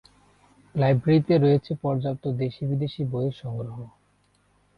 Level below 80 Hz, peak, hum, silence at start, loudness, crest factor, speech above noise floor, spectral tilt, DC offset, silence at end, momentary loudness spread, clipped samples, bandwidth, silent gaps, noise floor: -56 dBFS; -10 dBFS; 50 Hz at -50 dBFS; 0.75 s; -25 LUFS; 16 dB; 41 dB; -10 dB/octave; under 0.1%; 0.9 s; 14 LU; under 0.1%; 5.2 kHz; none; -65 dBFS